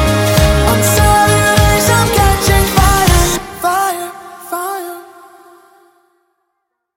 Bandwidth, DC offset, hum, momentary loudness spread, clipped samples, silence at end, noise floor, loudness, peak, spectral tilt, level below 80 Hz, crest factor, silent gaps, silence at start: 17 kHz; under 0.1%; none; 15 LU; under 0.1%; 1.95 s; -71 dBFS; -11 LUFS; 0 dBFS; -4 dB/octave; -20 dBFS; 12 dB; none; 0 s